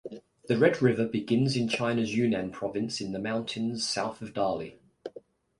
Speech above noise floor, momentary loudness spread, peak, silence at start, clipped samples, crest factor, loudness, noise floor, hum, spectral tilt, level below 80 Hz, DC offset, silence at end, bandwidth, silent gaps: 24 dB; 20 LU; -10 dBFS; 0.05 s; under 0.1%; 20 dB; -29 LUFS; -52 dBFS; none; -5.5 dB/octave; -64 dBFS; under 0.1%; 0.4 s; 11.5 kHz; none